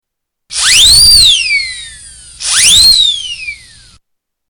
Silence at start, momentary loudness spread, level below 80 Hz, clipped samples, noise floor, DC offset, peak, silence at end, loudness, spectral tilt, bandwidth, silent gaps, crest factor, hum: 0.5 s; 19 LU; -30 dBFS; under 0.1%; -66 dBFS; under 0.1%; 0 dBFS; 0.95 s; -4 LUFS; 2 dB/octave; over 20 kHz; none; 10 dB; none